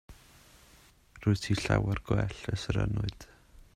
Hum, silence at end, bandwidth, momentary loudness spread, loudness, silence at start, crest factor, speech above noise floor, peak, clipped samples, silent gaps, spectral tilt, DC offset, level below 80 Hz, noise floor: none; 0.15 s; 12.5 kHz; 7 LU; -31 LUFS; 0.1 s; 22 dB; 30 dB; -10 dBFS; under 0.1%; none; -6 dB/octave; under 0.1%; -46 dBFS; -60 dBFS